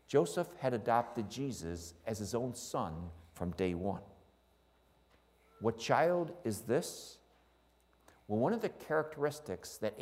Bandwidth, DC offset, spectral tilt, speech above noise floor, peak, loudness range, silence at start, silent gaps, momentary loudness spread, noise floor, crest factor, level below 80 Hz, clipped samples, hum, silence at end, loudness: 16 kHz; under 0.1%; -5.5 dB/octave; 34 dB; -14 dBFS; 5 LU; 0.1 s; none; 12 LU; -70 dBFS; 24 dB; -64 dBFS; under 0.1%; none; 0 s; -37 LUFS